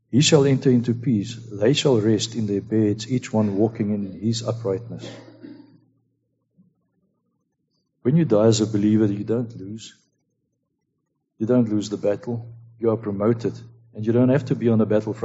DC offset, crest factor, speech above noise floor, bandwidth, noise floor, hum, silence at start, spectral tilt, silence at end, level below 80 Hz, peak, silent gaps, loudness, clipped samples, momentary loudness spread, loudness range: under 0.1%; 20 dB; 54 dB; 8 kHz; -75 dBFS; none; 0.1 s; -6.5 dB/octave; 0 s; -62 dBFS; -2 dBFS; none; -21 LUFS; under 0.1%; 15 LU; 8 LU